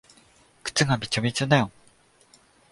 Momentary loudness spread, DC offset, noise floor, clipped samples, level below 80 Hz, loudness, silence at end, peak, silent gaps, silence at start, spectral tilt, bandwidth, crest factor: 10 LU; under 0.1%; -59 dBFS; under 0.1%; -58 dBFS; -24 LUFS; 1 s; -6 dBFS; none; 0.65 s; -4.5 dB/octave; 11.5 kHz; 20 dB